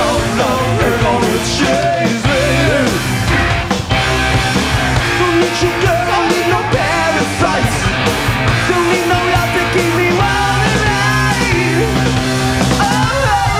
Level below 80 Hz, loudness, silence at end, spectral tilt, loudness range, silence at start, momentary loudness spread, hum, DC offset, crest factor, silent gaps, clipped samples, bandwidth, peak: -26 dBFS; -13 LUFS; 0 s; -4.5 dB/octave; 1 LU; 0 s; 2 LU; none; under 0.1%; 12 dB; none; under 0.1%; 16 kHz; 0 dBFS